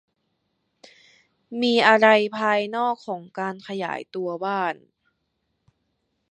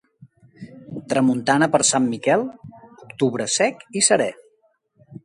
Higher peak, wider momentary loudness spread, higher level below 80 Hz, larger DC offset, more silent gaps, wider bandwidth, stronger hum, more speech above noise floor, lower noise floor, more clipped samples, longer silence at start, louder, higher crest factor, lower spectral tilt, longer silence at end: about the same, -2 dBFS vs -2 dBFS; second, 15 LU vs 18 LU; second, -78 dBFS vs -66 dBFS; neither; neither; second, 10 kHz vs 11.5 kHz; neither; first, 53 dB vs 45 dB; first, -75 dBFS vs -64 dBFS; neither; first, 1.5 s vs 0.6 s; second, -22 LUFS vs -19 LUFS; about the same, 22 dB vs 20 dB; first, -5 dB/octave vs -3.5 dB/octave; first, 1.55 s vs 0.05 s